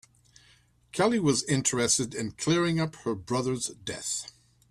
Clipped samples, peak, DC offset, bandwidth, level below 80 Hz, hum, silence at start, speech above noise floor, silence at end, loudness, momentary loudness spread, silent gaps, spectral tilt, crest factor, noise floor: under 0.1%; -10 dBFS; under 0.1%; 13.5 kHz; -60 dBFS; none; 0.95 s; 34 dB; 0.4 s; -28 LUFS; 10 LU; none; -4 dB/octave; 18 dB; -62 dBFS